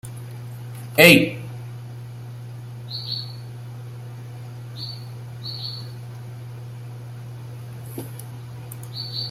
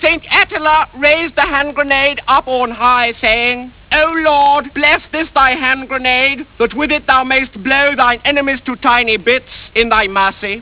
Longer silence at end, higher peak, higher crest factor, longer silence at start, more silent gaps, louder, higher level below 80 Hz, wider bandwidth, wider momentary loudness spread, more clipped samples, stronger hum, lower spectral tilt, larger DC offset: about the same, 0 s vs 0 s; about the same, 0 dBFS vs 0 dBFS; first, 26 dB vs 14 dB; about the same, 0.05 s vs 0 s; neither; second, -20 LUFS vs -12 LUFS; second, -58 dBFS vs -38 dBFS; first, 16 kHz vs 4 kHz; first, 17 LU vs 5 LU; neither; neither; second, -4.5 dB/octave vs -6.5 dB/octave; second, under 0.1% vs 0.1%